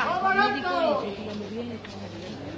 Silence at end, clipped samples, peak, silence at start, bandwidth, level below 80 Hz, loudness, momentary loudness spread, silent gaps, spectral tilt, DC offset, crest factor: 0 s; under 0.1%; -8 dBFS; 0 s; 8 kHz; -56 dBFS; -26 LUFS; 15 LU; none; -5.5 dB/octave; under 0.1%; 18 dB